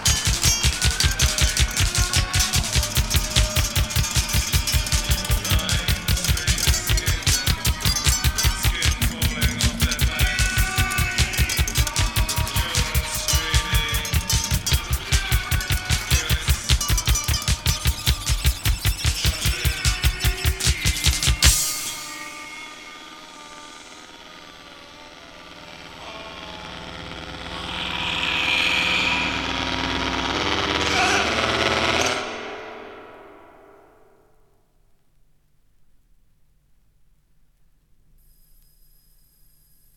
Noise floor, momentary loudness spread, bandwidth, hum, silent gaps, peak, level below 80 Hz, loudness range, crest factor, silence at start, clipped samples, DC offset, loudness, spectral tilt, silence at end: -58 dBFS; 19 LU; 19 kHz; none; none; 0 dBFS; -28 dBFS; 15 LU; 22 dB; 0 s; under 0.1%; under 0.1%; -21 LUFS; -2.5 dB/octave; 6.6 s